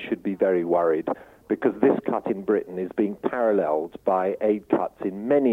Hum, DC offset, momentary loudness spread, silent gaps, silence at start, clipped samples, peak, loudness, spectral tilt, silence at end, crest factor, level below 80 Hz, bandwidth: none; under 0.1%; 8 LU; none; 0 s; under 0.1%; -6 dBFS; -24 LUFS; -9 dB/octave; 0 s; 18 dB; -64 dBFS; 4 kHz